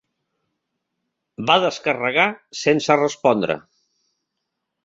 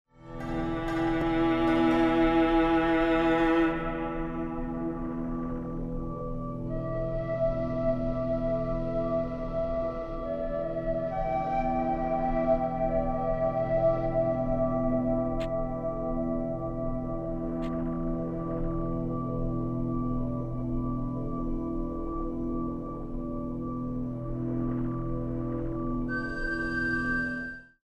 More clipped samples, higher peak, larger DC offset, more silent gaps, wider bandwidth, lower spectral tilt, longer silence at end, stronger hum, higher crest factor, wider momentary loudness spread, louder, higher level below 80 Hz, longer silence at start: neither; first, -2 dBFS vs -14 dBFS; second, under 0.1% vs 0.1%; neither; about the same, 7.8 kHz vs 7.2 kHz; second, -4 dB/octave vs -8.5 dB/octave; first, 1.25 s vs 0.2 s; neither; first, 22 dB vs 16 dB; second, 7 LU vs 10 LU; first, -19 LUFS vs -30 LUFS; second, -66 dBFS vs -38 dBFS; first, 1.4 s vs 0.2 s